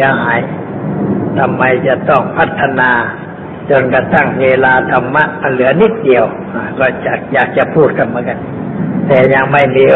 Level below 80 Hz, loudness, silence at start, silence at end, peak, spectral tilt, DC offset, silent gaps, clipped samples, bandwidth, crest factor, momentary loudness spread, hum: -44 dBFS; -11 LUFS; 0 s; 0 s; 0 dBFS; -9 dB/octave; under 0.1%; none; under 0.1%; 4.2 kHz; 12 dB; 11 LU; none